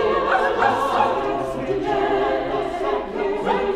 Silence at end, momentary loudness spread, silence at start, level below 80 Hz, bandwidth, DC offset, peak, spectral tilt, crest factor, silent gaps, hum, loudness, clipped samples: 0 s; 6 LU; 0 s; -44 dBFS; 13 kHz; under 0.1%; -6 dBFS; -5.5 dB/octave; 16 dB; none; none; -21 LUFS; under 0.1%